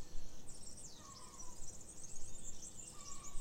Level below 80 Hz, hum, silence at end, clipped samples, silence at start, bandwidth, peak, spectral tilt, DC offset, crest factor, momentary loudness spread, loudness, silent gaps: -54 dBFS; none; 0 s; under 0.1%; 0 s; 15.5 kHz; -28 dBFS; -2.5 dB/octave; under 0.1%; 14 dB; 4 LU; -52 LUFS; none